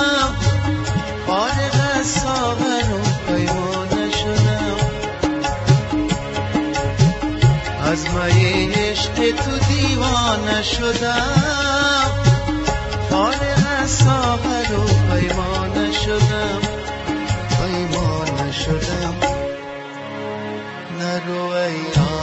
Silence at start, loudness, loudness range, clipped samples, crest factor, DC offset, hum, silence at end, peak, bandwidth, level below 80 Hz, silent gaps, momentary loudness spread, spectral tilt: 0 s; -19 LUFS; 4 LU; under 0.1%; 16 dB; under 0.1%; none; 0 s; -2 dBFS; 8.2 kHz; -32 dBFS; none; 7 LU; -5 dB/octave